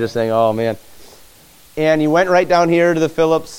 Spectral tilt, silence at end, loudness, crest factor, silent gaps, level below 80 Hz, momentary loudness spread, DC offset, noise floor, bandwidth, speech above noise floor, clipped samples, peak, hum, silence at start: -6 dB/octave; 0 s; -15 LUFS; 14 dB; none; -50 dBFS; 9 LU; under 0.1%; -46 dBFS; 17 kHz; 31 dB; under 0.1%; -2 dBFS; none; 0 s